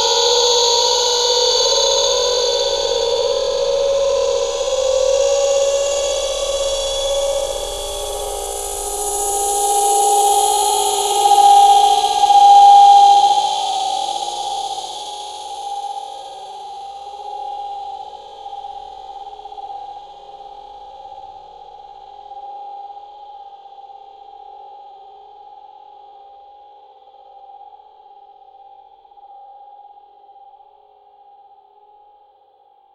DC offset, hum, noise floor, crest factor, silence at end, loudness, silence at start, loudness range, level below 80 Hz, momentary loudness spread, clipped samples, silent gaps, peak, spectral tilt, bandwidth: under 0.1%; none; -52 dBFS; 18 dB; 3.3 s; -14 LUFS; 0 s; 25 LU; -44 dBFS; 24 LU; under 0.1%; none; 0 dBFS; 0.5 dB/octave; 14 kHz